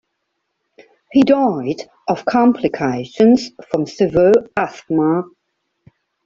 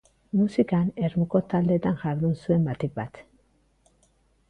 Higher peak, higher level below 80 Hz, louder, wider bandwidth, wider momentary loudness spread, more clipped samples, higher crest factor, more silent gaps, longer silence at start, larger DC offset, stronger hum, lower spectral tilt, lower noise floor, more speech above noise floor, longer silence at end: first, -2 dBFS vs -10 dBFS; about the same, -52 dBFS vs -56 dBFS; first, -16 LUFS vs -25 LUFS; second, 7.6 kHz vs 8.8 kHz; about the same, 10 LU vs 8 LU; neither; about the same, 14 dB vs 18 dB; neither; first, 1.15 s vs 0.35 s; neither; neither; second, -7 dB/octave vs -9.5 dB/octave; first, -73 dBFS vs -65 dBFS; first, 58 dB vs 41 dB; second, 1 s vs 1.3 s